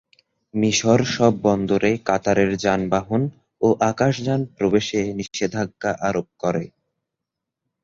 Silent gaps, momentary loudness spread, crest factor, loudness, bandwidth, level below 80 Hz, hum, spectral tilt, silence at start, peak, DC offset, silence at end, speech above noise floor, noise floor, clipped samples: none; 7 LU; 18 dB; -21 LUFS; 7.8 kHz; -52 dBFS; none; -5.5 dB/octave; 0.55 s; -2 dBFS; under 0.1%; 1.15 s; 63 dB; -83 dBFS; under 0.1%